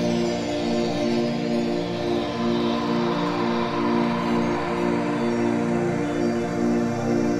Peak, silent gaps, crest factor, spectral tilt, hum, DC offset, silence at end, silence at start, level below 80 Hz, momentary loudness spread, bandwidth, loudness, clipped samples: -10 dBFS; none; 12 dB; -6 dB/octave; none; under 0.1%; 0 s; 0 s; -50 dBFS; 2 LU; 11 kHz; -24 LUFS; under 0.1%